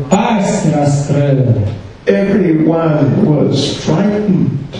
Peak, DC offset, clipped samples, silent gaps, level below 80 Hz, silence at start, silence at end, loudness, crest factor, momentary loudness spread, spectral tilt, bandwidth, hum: 0 dBFS; under 0.1%; under 0.1%; none; -40 dBFS; 0 s; 0 s; -12 LUFS; 12 dB; 3 LU; -7 dB/octave; 10.5 kHz; none